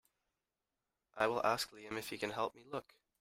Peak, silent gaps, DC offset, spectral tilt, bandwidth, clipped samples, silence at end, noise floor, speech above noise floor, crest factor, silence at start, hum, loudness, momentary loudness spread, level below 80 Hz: -18 dBFS; none; under 0.1%; -3.5 dB/octave; 16 kHz; under 0.1%; 0.4 s; under -90 dBFS; over 51 dB; 24 dB; 1.15 s; none; -39 LUFS; 13 LU; -74 dBFS